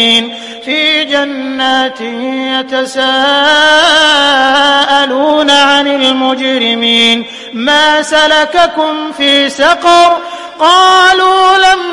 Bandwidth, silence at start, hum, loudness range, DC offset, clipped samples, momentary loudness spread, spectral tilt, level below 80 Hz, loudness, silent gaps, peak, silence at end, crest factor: 11.5 kHz; 0 s; none; 3 LU; under 0.1%; 0.2%; 10 LU; -1.5 dB/octave; -48 dBFS; -8 LUFS; none; 0 dBFS; 0 s; 8 dB